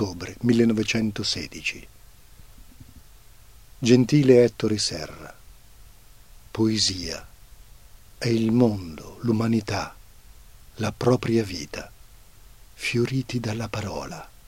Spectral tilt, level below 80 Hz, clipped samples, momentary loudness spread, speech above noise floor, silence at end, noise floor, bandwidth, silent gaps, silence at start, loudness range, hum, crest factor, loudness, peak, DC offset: -5.5 dB/octave; -50 dBFS; under 0.1%; 19 LU; 27 dB; 0.2 s; -50 dBFS; 16.5 kHz; none; 0 s; 6 LU; none; 22 dB; -23 LUFS; -4 dBFS; 0.2%